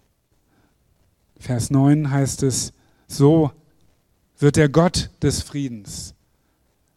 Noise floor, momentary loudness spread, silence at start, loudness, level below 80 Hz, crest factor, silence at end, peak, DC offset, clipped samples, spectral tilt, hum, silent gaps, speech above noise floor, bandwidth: -65 dBFS; 17 LU; 1.45 s; -19 LUFS; -44 dBFS; 20 dB; 0.85 s; 0 dBFS; under 0.1%; under 0.1%; -6 dB/octave; none; none; 46 dB; 13.5 kHz